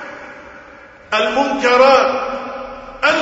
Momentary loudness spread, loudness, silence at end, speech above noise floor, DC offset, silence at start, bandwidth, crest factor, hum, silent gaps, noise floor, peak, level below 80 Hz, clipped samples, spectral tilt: 23 LU; -14 LUFS; 0 s; 27 dB; under 0.1%; 0 s; 8 kHz; 16 dB; none; none; -40 dBFS; 0 dBFS; -50 dBFS; under 0.1%; -3 dB/octave